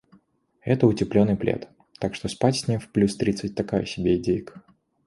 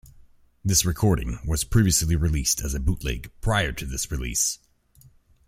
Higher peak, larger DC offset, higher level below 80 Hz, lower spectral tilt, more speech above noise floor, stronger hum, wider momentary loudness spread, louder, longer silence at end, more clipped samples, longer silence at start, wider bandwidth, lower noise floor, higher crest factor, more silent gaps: first, -4 dBFS vs -8 dBFS; neither; second, -50 dBFS vs -34 dBFS; first, -6.5 dB/octave vs -4 dB/octave; first, 39 dB vs 32 dB; neither; about the same, 9 LU vs 9 LU; about the same, -24 LUFS vs -24 LUFS; second, 0.45 s vs 0.9 s; neither; about the same, 0.65 s vs 0.65 s; second, 11.5 kHz vs 16.5 kHz; first, -62 dBFS vs -56 dBFS; about the same, 20 dB vs 18 dB; neither